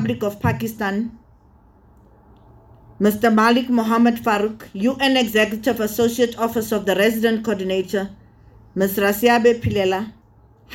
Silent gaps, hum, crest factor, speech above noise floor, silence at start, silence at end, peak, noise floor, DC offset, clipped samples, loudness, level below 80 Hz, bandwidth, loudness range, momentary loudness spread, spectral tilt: none; none; 18 dB; 33 dB; 0 s; 0 s; -2 dBFS; -51 dBFS; under 0.1%; under 0.1%; -19 LUFS; -48 dBFS; 18.5 kHz; 4 LU; 9 LU; -5 dB/octave